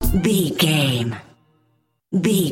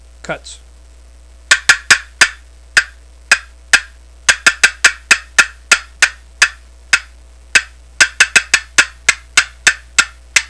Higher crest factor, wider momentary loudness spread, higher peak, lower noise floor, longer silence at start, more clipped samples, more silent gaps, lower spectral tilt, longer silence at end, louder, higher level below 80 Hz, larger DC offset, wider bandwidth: about the same, 16 dB vs 16 dB; first, 10 LU vs 6 LU; second, -4 dBFS vs 0 dBFS; first, -65 dBFS vs -40 dBFS; second, 0 s vs 0.3 s; second, under 0.1% vs 0.7%; neither; first, -5 dB/octave vs 1.5 dB/octave; about the same, 0 s vs 0.05 s; second, -19 LUFS vs -12 LUFS; first, -32 dBFS vs -40 dBFS; second, under 0.1% vs 0.3%; first, 17 kHz vs 11 kHz